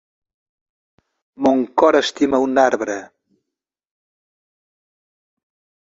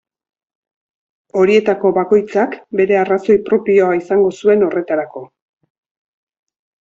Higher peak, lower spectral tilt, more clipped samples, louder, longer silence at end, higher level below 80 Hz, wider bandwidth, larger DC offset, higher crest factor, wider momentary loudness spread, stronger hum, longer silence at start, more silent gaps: about the same, -2 dBFS vs -2 dBFS; second, -4 dB/octave vs -7 dB/octave; neither; second, -17 LUFS vs -14 LUFS; first, 2.8 s vs 1.55 s; about the same, -62 dBFS vs -58 dBFS; about the same, 7.8 kHz vs 7.6 kHz; neither; first, 20 dB vs 14 dB; about the same, 9 LU vs 8 LU; neither; about the same, 1.4 s vs 1.35 s; neither